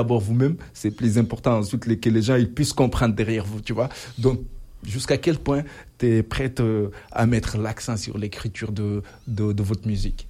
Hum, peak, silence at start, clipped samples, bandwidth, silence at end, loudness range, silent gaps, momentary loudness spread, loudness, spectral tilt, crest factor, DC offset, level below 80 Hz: none; -4 dBFS; 0 s; under 0.1%; 15 kHz; 0 s; 4 LU; none; 9 LU; -24 LUFS; -6.5 dB/octave; 18 dB; under 0.1%; -38 dBFS